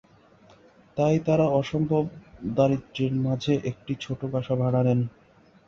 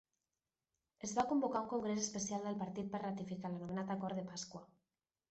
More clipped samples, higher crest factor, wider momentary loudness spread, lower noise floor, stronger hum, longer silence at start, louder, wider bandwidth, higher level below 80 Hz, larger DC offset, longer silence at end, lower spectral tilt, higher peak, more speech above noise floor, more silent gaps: neither; about the same, 18 dB vs 18 dB; about the same, 11 LU vs 10 LU; second, -55 dBFS vs under -90 dBFS; neither; about the same, 0.95 s vs 1 s; first, -25 LUFS vs -41 LUFS; second, 7.2 kHz vs 8.2 kHz; first, -56 dBFS vs -76 dBFS; neither; about the same, 0.6 s vs 0.65 s; first, -8 dB/octave vs -5 dB/octave; first, -8 dBFS vs -24 dBFS; second, 31 dB vs over 50 dB; neither